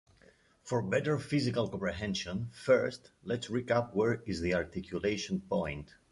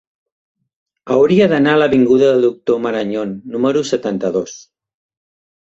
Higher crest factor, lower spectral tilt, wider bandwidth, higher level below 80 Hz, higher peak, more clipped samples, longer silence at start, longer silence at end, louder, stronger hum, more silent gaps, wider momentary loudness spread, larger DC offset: about the same, 18 dB vs 14 dB; about the same, -6 dB/octave vs -6 dB/octave; first, 11.5 kHz vs 8 kHz; about the same, -56 dBFS vs -56 dBFS; second, -14 dBFS vs -2 dBFS; neither; second, 0.65 s vs 1.05 s; second, 0.25 s vs 1.2 s; second, -33 LUFS vs -15 LUFS; neither; neither; about the same, 10 LU vs 10 LU; neither